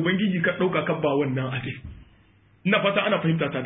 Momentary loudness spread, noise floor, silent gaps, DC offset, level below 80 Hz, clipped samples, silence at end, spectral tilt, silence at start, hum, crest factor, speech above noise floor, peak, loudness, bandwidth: 11 LU; -58 dBFS; none; under 0.1%; -54 dBFS; under 0.1%; 0 s; -11 dB/octave; 0 s; none; 18 dB; 34 dB; -6 dBFS; -24 LUFS; 3.9 kHz